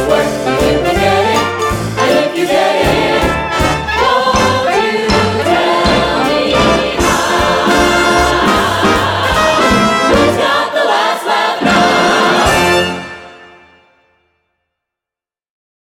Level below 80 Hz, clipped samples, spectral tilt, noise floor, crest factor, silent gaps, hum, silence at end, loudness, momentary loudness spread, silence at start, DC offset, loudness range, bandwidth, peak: -30 dBFS; under 0.1%; -4 dB/octave; -88 dBFS; 12 dB; none; none; 2.45 s; -11 LUFS; 4 LU; 0 s; under 0.1%; 3 LU; 20 kHz; 0 dBFS